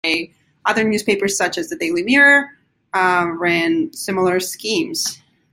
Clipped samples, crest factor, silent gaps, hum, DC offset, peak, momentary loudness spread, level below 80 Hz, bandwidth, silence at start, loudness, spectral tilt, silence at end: under 0.1%; 16 dB; none; none; under 0.1%; -2 dBFS; 11 LU; -60 dBFS; 16.5 kHz; 0.05 s; -17 LUFS; -3 dB/octave; 0.4 s